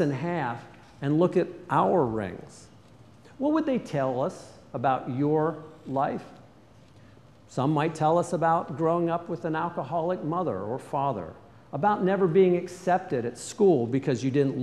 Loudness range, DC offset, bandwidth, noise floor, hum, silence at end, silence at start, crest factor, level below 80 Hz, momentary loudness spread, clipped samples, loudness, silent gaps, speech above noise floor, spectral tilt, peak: 4 LU; under 0.1%; 12 kHz; -54 dBFS; none; 0 s; 0 s; 18 dB; -64 dBFS; 11 LU; under 0.1%; -27 LUFS; none; 28 dB; -7.5 dB/octave; -10 dBFS